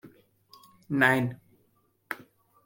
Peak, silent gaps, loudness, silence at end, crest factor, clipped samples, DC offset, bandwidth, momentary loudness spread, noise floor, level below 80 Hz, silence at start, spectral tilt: -6 dBFS; none; -25 LUFS; 0.5 s; 26 dB; under 0.1%; under 0.1%; 16.5 kHz; 17 LU; -69 dBFS; -70 dBFS; 0.05 s; -6 dB/octave